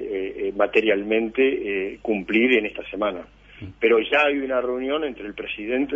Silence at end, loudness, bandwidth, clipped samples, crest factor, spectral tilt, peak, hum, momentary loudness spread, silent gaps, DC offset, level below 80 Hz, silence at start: 0 s; -22 LUFS; 7.4 kHz; under 0.1%; 18 dB; -6.5 dB/octave; -4 dBFS; none; 12 LU; none; under 0.1%; -54 dBFS; 0 s